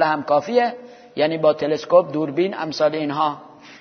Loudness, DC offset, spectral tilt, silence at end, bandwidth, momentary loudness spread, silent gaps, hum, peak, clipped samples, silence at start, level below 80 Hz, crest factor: -20 LUFS; under 0.1%; -6 dB/octave; 0.05 s; 6.6 kHz; 7 LU; none; none; -2 dBFS; under 0.1%; 0 s; -70 dBFS; 18 dB